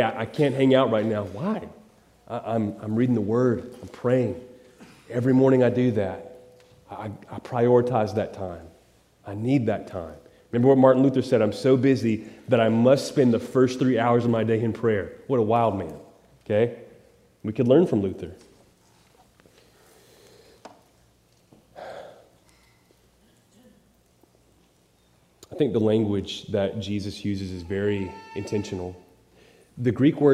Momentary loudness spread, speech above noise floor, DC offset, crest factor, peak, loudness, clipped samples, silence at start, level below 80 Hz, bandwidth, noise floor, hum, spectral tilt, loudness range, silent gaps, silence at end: 18 LU; 39 dB; under 0.1%; 20 dB; -4 dBFS; -23 LUFS; under 0.1%; 0 s; -64 dBFS; 12.5 kHz; -62 dBFS; none; -7.5 dB/octave; 7 LU; none; 0 s